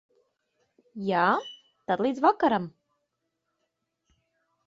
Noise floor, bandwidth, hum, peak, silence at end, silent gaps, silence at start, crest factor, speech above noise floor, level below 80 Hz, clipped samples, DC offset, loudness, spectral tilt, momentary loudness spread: -80 dBFS; 7.8 kHz; none; -8 dBFS; 1.95 s; none; 0.95 s; 22 dB; 56 dB; -74 dBFS; under 0.1%; under 0.1%; -26 LUFS; -6.5 dB/octave; 20 LU